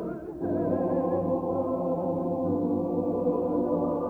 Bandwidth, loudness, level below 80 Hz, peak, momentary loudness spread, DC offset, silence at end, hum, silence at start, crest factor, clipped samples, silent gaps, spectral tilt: 3.6 kHz; -28 LUFS; -56 dBFS; -14 dBFS; 2 LU; under 0.1%; 0 s; none; 0 s; 14 dB; under 0.1%; none; -11.5 dB/octave